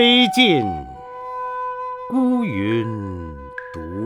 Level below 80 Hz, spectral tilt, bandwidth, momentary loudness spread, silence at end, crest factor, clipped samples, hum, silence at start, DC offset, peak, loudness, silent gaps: -46 dBFS; -5 dB/octave; 15 kHz; 19 LU; 0 s; 18 dB; under 0.1%; 50 Hz at -50 dBFS; 0 s; under 0.1%; -2 dBFS; -19 LUFS; none